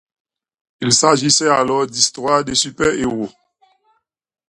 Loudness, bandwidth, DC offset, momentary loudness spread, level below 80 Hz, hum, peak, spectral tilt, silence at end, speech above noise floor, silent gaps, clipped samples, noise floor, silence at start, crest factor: -15 LUFS; 16 kHz; under 0.1%; 10 LU; -50 dBFS; none; 0 dBFS; -2.5 dB/octave; 1.2 s; 48 dB; none; under 0.1%; -64 dBFS; 0.8 s; 18 dB